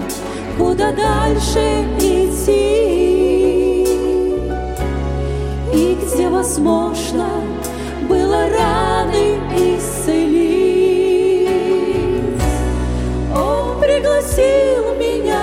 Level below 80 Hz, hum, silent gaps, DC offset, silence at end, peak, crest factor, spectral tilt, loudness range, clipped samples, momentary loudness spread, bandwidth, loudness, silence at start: -26 dBFS; none; none; under 0.1%; 0 s; -2 dBFS; 14 dB; -5.5 dB/octave; 3 LU; under 0.1%; 7 LU; 16.5 kHz; -16 LUFS; 0 s